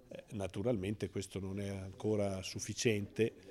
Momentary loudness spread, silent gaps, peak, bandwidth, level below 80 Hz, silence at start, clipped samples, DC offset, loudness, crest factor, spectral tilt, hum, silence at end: 8 LU; none; -18 dBFS; 15 kHz; -68 dBFS; 0.1 s; under 0.1%; under 0.1%; -38 LUFS; 20 dB; -5 dB/octave; none; 0 s